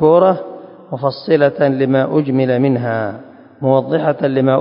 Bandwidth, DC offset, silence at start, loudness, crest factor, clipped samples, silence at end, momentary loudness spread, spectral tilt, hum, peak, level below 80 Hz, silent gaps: 5.4 kHz; under 0.1%; 0 s; -15 LUFS; 14 dB; under 0.1%; 0 s; 12 LU; -12 dB/octave; none; 0 dBFS; -56 dBFS; none